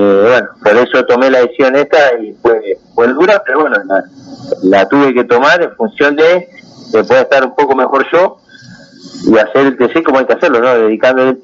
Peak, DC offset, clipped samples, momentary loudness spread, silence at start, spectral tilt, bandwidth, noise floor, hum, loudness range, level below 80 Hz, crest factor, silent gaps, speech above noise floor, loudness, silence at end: 0 dBFS; under 0.1%; under 0.1%; 7 LU; 0 s; -5.5 dB/octave; 7.4 kHz; -36 dBFS; none; 2 LU; -54 dBFS; 10 dB; none; 27 dB; -10 LUFS; 0.05 s